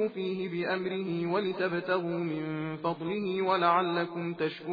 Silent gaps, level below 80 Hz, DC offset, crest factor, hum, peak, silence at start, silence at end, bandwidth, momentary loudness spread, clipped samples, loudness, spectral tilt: none; -82 dBFS; under 0.1%; 18 dB; none; -12 dBFS; 0 s; 0 s; 5 kHz; 8 LU; under 0.1%; -31 LUFS; -8.5 dB/octave